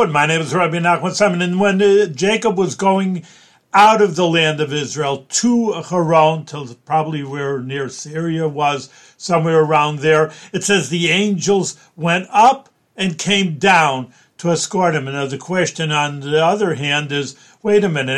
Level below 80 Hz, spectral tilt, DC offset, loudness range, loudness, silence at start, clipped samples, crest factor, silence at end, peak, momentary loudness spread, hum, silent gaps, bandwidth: -60 dBFS; -4.5 dB/octave; under 0.1%; 4 LU; -16 LUFS; 0 s; under 0.1%; 16 dB; 0 s; 0 dBFS; 11 LU; none; none; 12.5 kHz